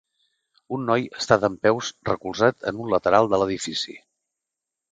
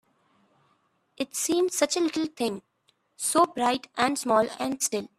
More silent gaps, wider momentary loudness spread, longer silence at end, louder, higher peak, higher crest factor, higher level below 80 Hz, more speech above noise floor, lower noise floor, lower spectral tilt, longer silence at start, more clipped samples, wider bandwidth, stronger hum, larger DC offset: neither; first, 11 LU vs 8 LU; first, 0.95 s vs 0.15 s; first, -23 LUFS vs -26 LUFS; first, 0 dBFS vs -8 dBFS; about the same, 24 dB vs 20 dB; first, -56 dBFS vs -70 dBFS; first, 64 dB vs 43 dB; first, -86 dBFS vs -69 dBFS; first, -4.5 dB/octave vs -2.5 dB/octave; second, 0.7 s vs 1.2 s; neither; second, 9.4 kHz vs 15.5 kHz; neither; neither